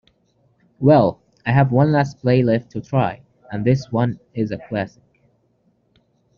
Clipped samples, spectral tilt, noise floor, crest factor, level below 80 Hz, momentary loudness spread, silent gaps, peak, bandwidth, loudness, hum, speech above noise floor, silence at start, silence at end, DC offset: under 0.1%; -7.5 dB/octave; -63 dBFS; 18 dB; -54 dBFS; 11 LU; none; -2 dBFS; 7 kHz; -19 LUFS; none; 45 dB; 0.8 s; 1.5 s; under 0.1%